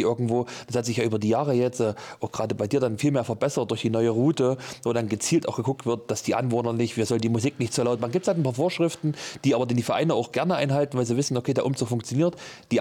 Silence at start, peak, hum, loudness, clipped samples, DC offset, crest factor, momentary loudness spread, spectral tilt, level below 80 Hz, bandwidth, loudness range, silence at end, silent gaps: 0 s; -12 dBFS; none; -25 LUFS; under 0.1%; under 0.1%; 12 dB; 5 LU; -6 dB/octave; -66 dBFS; 17 kHz; 1 LU; 0 s; none